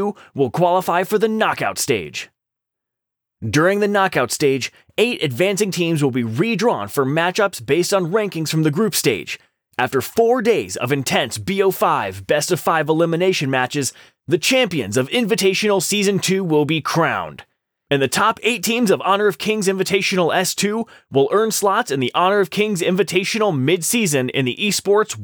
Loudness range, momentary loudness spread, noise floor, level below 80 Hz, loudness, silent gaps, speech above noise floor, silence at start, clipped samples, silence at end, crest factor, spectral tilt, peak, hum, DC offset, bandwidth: 2 LU; 5 LU; -83 dBFS; -62 dBFS; -18 LUFS; none; 65 dB; 0 s; under 0.1%; 0 s; 14 dB; -4 dB/octave; -4 dBFS; none; under 0.1%; over 20 kHz